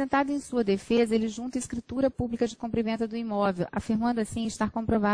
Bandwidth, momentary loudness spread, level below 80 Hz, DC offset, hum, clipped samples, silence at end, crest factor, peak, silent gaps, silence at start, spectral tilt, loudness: 10.5 kHz; 6 LU; -52 dBFS; under 0.1%; none; under 0.1%; 0 s; 14 dB; -12 dBFS; none; 0 s; -6 dB/octave; -28 LUFS